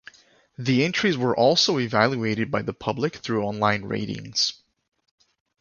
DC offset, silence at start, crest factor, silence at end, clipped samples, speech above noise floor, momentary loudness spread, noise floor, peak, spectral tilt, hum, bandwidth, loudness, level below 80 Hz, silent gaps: under 0.1%; 0.6 s; 22 dB; 1.05 s; under 0.1%; 27 dB; 9 LU; -51 dBFS; -4 dBFS; -4.5 dB/octave; none; 7.4 kHz; -23 LUFS; -58 dBFS; none